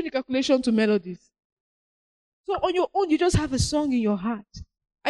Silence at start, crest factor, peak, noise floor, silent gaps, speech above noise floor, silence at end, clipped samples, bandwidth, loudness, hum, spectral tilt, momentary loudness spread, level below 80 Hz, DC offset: 0 s; 18 dB; -8 dBFS; under -90 dBFS; 1.44-2.44 s; over 66 dB; 0 s; under 0.1%; 12 kHz; -24 LUFS; none; -5.5 dB/octave; 12 LU; -42 dBFS; under 0.1%